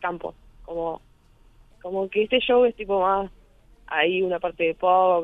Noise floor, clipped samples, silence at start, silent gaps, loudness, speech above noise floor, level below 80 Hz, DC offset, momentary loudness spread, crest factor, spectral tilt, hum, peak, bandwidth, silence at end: -55 dBFS; under 0.1%; 0 s; none; -23 LUFS; 33 dB; -52 dBFS; under 0.1%; 16 LU; 16 dB; -7 dB/octave; none; -8 dBFS; 4 kHz; 0 s